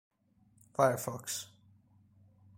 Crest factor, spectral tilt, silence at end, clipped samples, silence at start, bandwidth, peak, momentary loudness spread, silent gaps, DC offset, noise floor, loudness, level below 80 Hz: 26 dB; -4 dB/octave; 1.15 s; under 0.1%; 0.8 s; 16.5 kHz; -12 dBFS; 13 LU; none; under 0.1%; -68 dBFS; -34 LUFS; -74 dBFS